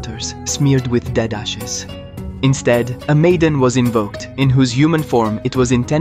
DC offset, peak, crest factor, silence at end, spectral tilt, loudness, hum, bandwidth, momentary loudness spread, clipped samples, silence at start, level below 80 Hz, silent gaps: under 0.1%; -2 dBFS; 14 dB; 0 s; -5.5 dB/octave; -16 LUFS; none; 14.5 kHz; 11 LU; under 0.1%; 0 s; -36 dBFS; none